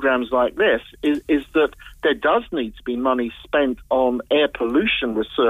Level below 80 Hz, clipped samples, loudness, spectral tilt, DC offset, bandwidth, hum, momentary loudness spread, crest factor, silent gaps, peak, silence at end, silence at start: -46 dBFS; under 0.1%; -21 LUFS; -5.5 dB/octave; under 0.1%; 15 kHz; none; 5 LU; 12 dB; none; -8 dBFS; 0 s; 0 s